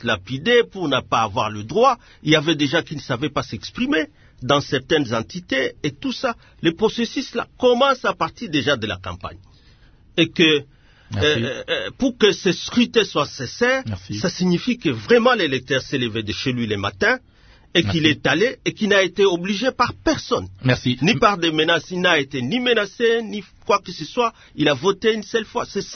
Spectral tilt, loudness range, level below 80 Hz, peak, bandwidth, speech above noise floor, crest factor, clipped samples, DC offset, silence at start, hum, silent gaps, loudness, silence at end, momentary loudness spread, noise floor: -4.5 dB/octave; 3 LU; -50 dBFS; 0 dBFS; 6.6 kHz; 30 dB; 20 dB; under 0.1%; under 0.1%; 0 s; none; none; -20 LUFS; 0 s; 9 LU; -50 dBFS